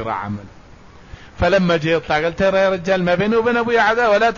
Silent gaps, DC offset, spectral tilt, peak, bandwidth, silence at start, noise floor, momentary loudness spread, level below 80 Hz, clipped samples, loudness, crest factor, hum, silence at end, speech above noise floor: none; 0.3%; -6 dB/octave; -4 dBFS; 7.4 kHz; 0 s; -43 dBFS; 9 LU; -40 dBFS; under 0.1%; -17 LUFS; 14 dB; none; 0 s; 26 dB